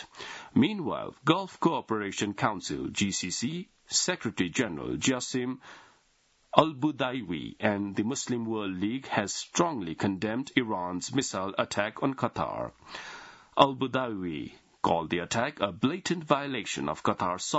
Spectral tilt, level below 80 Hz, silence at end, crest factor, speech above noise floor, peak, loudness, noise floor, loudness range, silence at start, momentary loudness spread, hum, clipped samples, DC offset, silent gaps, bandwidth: -4 dB/octave; -64 dBFS; 0 s; 28 dB; 38 dB; -2 dBFS; -30 LUFS; -68 dBFS; 1 LU; 0 s; 9 LU; none; under 0.1%; under 0.1%; none; 8 kHz